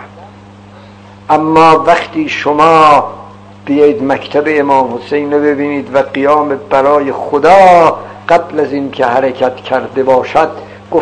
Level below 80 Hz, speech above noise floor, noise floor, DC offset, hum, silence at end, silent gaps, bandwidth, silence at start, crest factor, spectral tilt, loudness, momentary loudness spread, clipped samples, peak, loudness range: -48 dBFS; 25 dB; -34 dBFS; under 0.1%; none; 0 s; none; 11 kHz; 0 s; 10 dB; -6 dB/octave; -10 LUFS; 10 LU; 3%; 0 dBFS; 3 LU